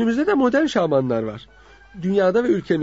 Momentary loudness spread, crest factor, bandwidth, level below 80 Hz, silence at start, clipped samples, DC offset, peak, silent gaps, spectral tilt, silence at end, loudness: 11 LU; 14 dB; 8 kHz; -52 dBFS; 0 s; under 0.1%; under 0.1%; -6 dBFS; none; -7 dB/octave; 0 s; -20 LUFS